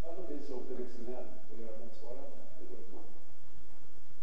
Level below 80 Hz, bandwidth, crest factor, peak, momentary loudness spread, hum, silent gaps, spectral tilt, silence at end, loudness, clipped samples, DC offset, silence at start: -64 dBFS; 8.4 kHz; 16 dB; -22 dBFS; 18 LU; none; none; -7.5 dB/octave; 0 s; -48 LUFS; under 0.1%; 6%; 0 s